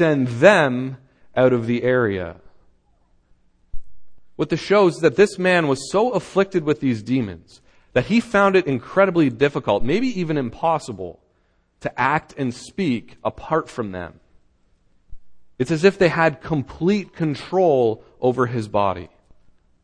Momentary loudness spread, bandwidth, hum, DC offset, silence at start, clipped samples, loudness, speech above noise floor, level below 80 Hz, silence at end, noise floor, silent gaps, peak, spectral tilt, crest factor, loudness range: 13 LU; 10 kHz; none; under 0.1%; 0 s; under 0.1%; -20 LUFS; 44 dB; -48 dBFS; 0.8 s; -63 dBFS; none; 0 dBFS; -6.5 dB/octave; 20 dB; 6 LU